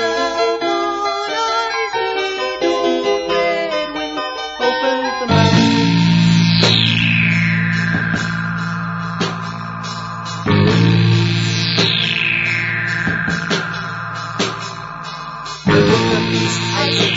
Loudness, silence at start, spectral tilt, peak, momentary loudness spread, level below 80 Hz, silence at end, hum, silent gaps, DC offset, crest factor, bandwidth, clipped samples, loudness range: -16 LUFS; 0 s; -5 dB/octave; 0 dBFS; 12 LU; -44 dBFS; 0 s; none; none; under 0.1%; 16 dB; 7.8 kHz; under 0.1%; 5 LU